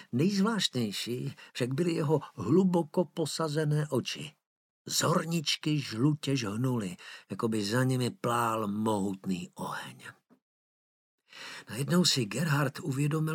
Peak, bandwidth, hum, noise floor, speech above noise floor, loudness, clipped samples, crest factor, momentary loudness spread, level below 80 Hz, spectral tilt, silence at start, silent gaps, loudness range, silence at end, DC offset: -14 dBFS; 17 kHz; none; under -90 dBFS; over 60 dB; -30 LUFS; under 0.1%; 18 dB; 13 LU; -74 dBFS; -5 dB/octave; 0 s; 4.47-4.85 s, 10.42-11.18 s; 4 LU; 0 s; under 0.1%